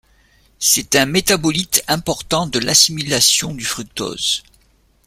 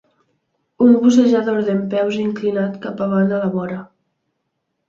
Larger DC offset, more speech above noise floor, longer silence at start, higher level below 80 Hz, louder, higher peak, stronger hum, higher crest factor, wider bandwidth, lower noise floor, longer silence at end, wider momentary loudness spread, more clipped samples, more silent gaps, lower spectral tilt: neither; second, 39 dB vs 57 dB; second, 0.6 s vs 0.8 s; first, -46 dBFS vs -62 dBFS; about the same, -15 LUFS vs -17 LUFS; about the same, 0 dBFS vs -2 dBFS; neither; about the same, 18 dB vs 16 dB; first, 16.5 kHz vs 7.6 kHz; second, -56 dBFS vs -73 dBFS; second, 0.65 s vs 1.05 s; about the same, 11 LU vs 12 LU; neither; neither; second, -2 dB/octave vs -7 dB/octave